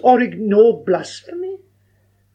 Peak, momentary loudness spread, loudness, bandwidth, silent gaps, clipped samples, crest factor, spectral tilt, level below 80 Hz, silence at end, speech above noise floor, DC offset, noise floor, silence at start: -2 dBFS; 17 LU; -15 LUFS; 9.2 kHz; none; under 0.1%; 16 dB; -6.5 dB/octave; -70 dBFS; 0.8 s; 44 dB; under 0.1%; -59 dBFS; 0.05 s